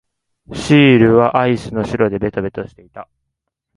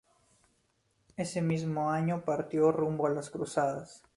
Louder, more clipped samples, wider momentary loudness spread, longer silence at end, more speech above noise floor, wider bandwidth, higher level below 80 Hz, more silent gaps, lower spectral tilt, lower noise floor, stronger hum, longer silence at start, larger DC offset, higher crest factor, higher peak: first, -14 LUFS vs -31 LUFS; neither; first, 19 LU vs 9 LU; first, 0.7 s vs 0.2 s; first, 62 dB vs 43 dB; about the same, 11.5 kHz vs 11.5 kHz; first, -44 dBFS vs -68 dBFS; neither; about the same, -7 dB/octave vs -7 dB/octave; about the same, -76 dBFS vs -74 dBFS; neither; second, 0.5 s vs 1.2 s; neither; about the same, 16 dB vs 18 dB; first, 0 dBFS vs -14 dBFS